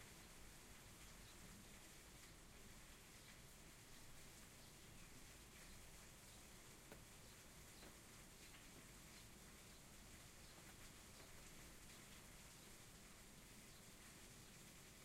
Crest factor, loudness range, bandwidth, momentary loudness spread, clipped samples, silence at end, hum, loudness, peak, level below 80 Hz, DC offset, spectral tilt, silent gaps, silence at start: 18 dB; 1 LU; 16 kHz; 1 LU; under 0.1%; 0 s; none; -62 LUFS; -44 dBFS; -70 dBFS; under 0.1%; -2.5 dB/octave; none; 0 s